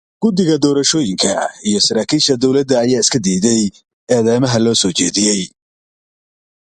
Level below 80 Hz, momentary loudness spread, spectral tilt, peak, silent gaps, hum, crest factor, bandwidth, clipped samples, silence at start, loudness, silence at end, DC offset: -50 dBFS; 5 LU; -4 dB/octave; 0 dBFS; 3.93-4.07 s; none; 16 dB; 11.5 kHz; under 0.1%; 0.2 s; -14 LUFS; 1.2 s; under 0.1%